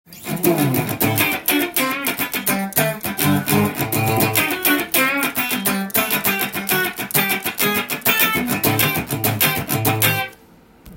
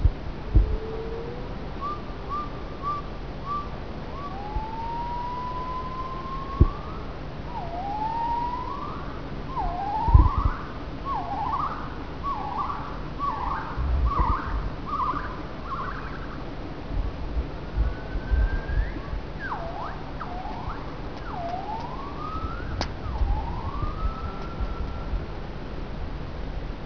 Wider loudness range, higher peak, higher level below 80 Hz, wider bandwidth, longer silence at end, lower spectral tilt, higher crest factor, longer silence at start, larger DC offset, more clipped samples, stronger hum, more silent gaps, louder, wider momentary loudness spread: second, 1 LU vs 7 LU; about the same, 0 dBFS vs -2 dBFS; second, -52 dBFS vs -30 dBFS; first, 17 kHz vs 5.4 kHz; about the same, 0 s vs 0 s; second, -3.5 dB/octave vs -7.5 dB/octave; second, 20 dB vs 26 dB; about the same, 0.1 s vs 0 s; second, under 0.1% vs 1%; neither; neither; neither; first, -18 LUFS vs -30 LUFS; second, 4 LU vs 10 LU